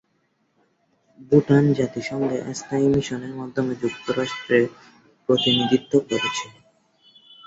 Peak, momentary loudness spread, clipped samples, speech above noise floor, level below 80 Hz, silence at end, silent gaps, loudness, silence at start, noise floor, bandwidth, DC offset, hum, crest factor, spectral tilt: -4 dBFS; 11 LU; under 0.1%; 47 dB; -56 dBFS; 0.95 s; none; -22 LUFS; 1.2 s; -68 dBFS; 8 kHz; under 0.1%; none; 20 dB; -5.5 dB/octave